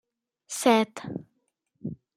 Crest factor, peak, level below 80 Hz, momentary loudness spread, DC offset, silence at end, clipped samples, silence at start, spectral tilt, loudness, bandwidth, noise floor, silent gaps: 22 dB; -8 dBFS; -70 dBFS; 18 LU; under 0.1%; 0.25 s; under 0.1%; 0.5 s; -4 dB/octave; -25 LUFS; 16 kHz; -76 dBFS; none